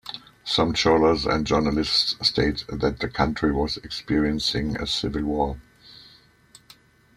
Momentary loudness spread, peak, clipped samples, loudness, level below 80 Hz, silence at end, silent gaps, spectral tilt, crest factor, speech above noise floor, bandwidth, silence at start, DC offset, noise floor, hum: 8 LU; -4 dBFS; under 0.1%; -23 LUFS; -40 dBFS; 1.2 s; none; -5 dB/octave; 20 dB; 31 dB; 15 kHz; 0.05 s; under 0.1%; -54 dBFS; none